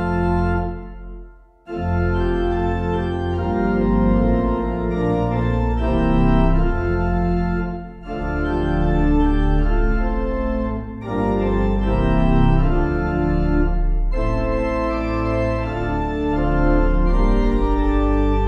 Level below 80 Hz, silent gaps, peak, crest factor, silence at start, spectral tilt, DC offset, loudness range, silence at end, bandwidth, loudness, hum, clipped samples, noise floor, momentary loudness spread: -22 dBFS; none; -4 dBFS; 14 dB; 0 s; -9.5 dB/octave; under 0.1%; 2 LU; 0 s; 5.6 kHz; -20 LUFS; none; under 0.1%; -41 dBFS; 6 LU